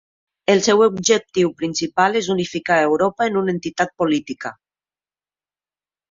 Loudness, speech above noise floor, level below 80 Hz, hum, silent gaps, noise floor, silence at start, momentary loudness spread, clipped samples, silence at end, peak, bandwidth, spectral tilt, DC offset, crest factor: -18 LUFS; over 72 dB; -60 dBFS; none; none; under -90 dBFS; 0.5 s; 8 LU; under 0.1%; 1.6 s; -2 dBFS; 7.8 kHz; -4 dB/octave; under 0.1%; 18 dB